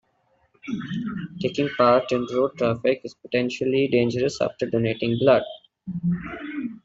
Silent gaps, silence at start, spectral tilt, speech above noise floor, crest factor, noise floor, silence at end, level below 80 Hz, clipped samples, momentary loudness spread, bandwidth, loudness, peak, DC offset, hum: none; 0.65 s; -6.5 dB/octave; 43 dB; 20 dB; -66 dBFS; 0.05 s; -58 dBFS; under 0.1%; 14 LU; 8 kHz; -24 LUFS; -4 dBFS; under 0.1%; none